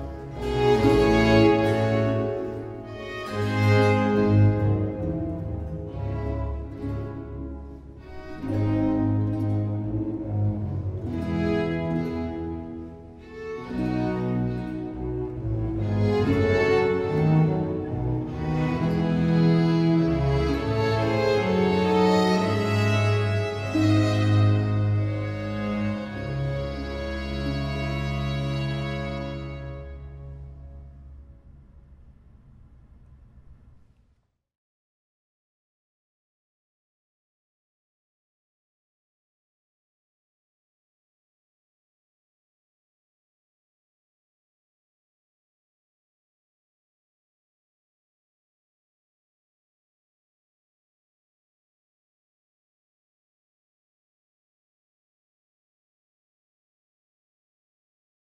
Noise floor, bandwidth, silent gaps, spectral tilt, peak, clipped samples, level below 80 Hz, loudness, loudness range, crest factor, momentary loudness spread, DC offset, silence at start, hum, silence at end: -68 dBFS; 10 kHz; none; -7.5 dB/octave; -6 dBFS; under 0.1%; -42 dBFS; -24 LUFS; 9 LU; 22 dB; 16 LU; under 0.1%; 0 s; none; 24.85 s